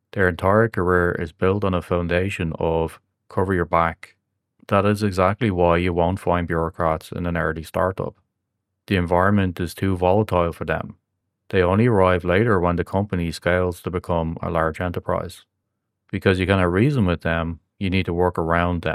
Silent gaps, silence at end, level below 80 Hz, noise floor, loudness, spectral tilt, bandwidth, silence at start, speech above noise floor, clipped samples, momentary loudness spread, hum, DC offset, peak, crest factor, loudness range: none; 0 s; -46 dBFS; -78 dBFS; -21 LUFS; -7.5 dB/octave; 14 kHz; 0.15 s; 57 dB; under 0.1%; 8 LU; none; under 0.1%; 0 dBFS; 20 dB; 3 LU